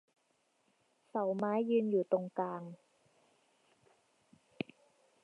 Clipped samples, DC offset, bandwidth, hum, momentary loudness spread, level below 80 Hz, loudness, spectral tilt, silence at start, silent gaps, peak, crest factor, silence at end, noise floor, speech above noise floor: under 0.1%; under 0.1%; 10 kHz; none; 14 LU; -88 dBFS; -36 LUFS; -8.5 dB/octave; 1.15 s; none; -18 dBFS; 20 dB; 2.5 s; -77 dBFS; 43 dB